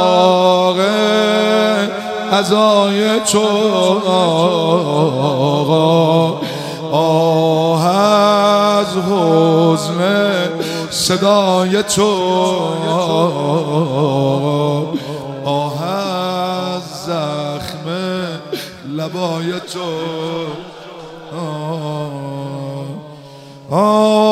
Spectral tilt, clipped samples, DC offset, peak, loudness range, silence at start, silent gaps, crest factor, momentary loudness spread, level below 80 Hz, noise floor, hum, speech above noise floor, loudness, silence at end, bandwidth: -5 dB/octave; under 0.1%; under 0.1%; 0 dBFS; 10 LU; 0 s; none; 14 dB; 13 LU; -58 dBFS; -36 dBFS; none; 22 dB; -15 LUFS; 0 s; 15.5 kHz